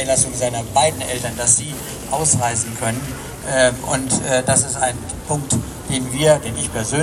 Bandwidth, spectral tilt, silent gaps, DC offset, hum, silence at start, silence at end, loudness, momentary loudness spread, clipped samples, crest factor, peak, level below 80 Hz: 16 kHz; -3.5 dB/octave; none; under 0.1%; none; 0 s; 0 s; -18 LUFS; 9 LU; under 0.1%; 20 dB; 0 dBFS; -40 dBFS